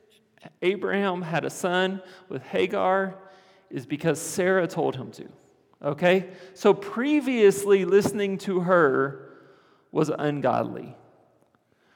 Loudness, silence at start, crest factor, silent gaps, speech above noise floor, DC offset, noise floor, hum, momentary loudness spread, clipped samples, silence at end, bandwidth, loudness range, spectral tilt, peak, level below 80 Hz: -24 LUFS; 0.45 s; 20 dB; none; 41 dB; under 0.1%; -65 dBFS; none; 18 LU; under 0.1%; 1 s; 17.5 kHz; 5 LU; -5.5 dB/octave; -6 dBFS; -74 dBFS